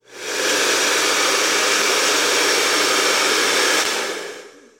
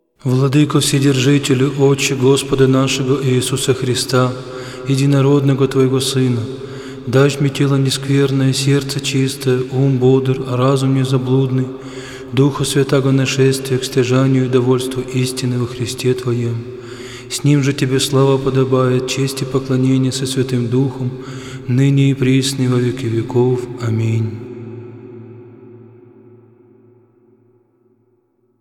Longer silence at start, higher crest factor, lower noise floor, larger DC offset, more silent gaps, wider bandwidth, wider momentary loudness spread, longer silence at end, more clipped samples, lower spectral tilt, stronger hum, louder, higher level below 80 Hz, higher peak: second, 0.1 s vs 0.25 s; about the same, 14 dB vs 14 dB; second, -38 dBFS vs -60 dBFS; neither; neither; about the same, 16.5 kHz vs 15.5 kHz; second, 7 LU vs 13 LU; second, 0.3 s vs 2.75 s; neither; second, 0.5 dB/octave vs -6 dB/octave; neither; about the same, -16 LUFS vs -15 LUFS; second, -70 dBFS vs -48 dBFS; second, -4 dBFS vs 0 dBFS